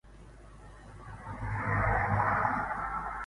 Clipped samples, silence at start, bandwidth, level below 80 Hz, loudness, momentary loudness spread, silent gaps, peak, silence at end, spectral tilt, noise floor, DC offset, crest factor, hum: under 0.1%; 0.05 s; 11 kHz; -44 dBFS; -31 LUFS; 22 LU; none; -14 dBFS; 0 s; -8 dB/octave; -52 dBFS; under 0.1%; 18 dB; none